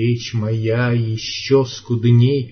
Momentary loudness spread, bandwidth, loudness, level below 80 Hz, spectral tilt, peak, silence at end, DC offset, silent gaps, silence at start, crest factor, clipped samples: 8 LU; 6.6 kHz; -18 LUFS; -54 dBFS; -7 dB/octave; -2 dBFS; 0 s; under 0.1%; none; 0 s; 14 dB; under 0.1%